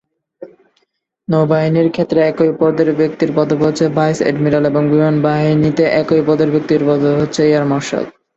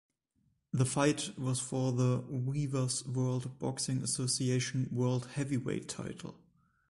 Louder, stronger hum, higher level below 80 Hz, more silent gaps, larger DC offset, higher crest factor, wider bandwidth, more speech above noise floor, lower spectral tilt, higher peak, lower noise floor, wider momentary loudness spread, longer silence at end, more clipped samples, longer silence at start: first, -14 LUFS vs -34 LUFS; neither; first, -50 dBFS vs -64 dBFS; neither; neither; second, 12 dB vs 18 dB; second, 8 kHz vs 11.5 kHz; first, 52 dB vs 43 dB; first, -7 dB/octave vs -5 dB/octave; first, 0 dBFS vs -16 dBFS; second, -65 dBFS vs -76 dBFS; second, 3 LU vs 8 LU; second, 0.25 s vs 0.55 s; neither; second, 0.4 s vs 0.75 s